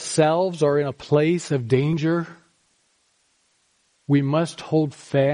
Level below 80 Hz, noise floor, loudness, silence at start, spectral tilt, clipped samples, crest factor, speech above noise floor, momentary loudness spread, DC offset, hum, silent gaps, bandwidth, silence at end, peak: -62 dBFS; -66 dBFS; -22 LUFS; 0 s; -6.5 dB/octave; under 0.1%; 16 dB; 45 dB; 4 LU; under 0.1%; none; none; 10.5 kHz; 0 s; -6 dBFS